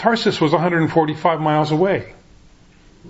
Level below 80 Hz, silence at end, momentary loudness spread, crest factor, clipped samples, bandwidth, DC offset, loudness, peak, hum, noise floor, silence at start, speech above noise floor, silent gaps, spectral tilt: -52 dBFS; 0 s; 2 LU; 18 dB; under 0.1%; 8 kHz; under 0.1%; -18 LUFS; -2 dBFS; none; -48 dBFS; 0 s; 31 dB; none; -6.5 dB/octave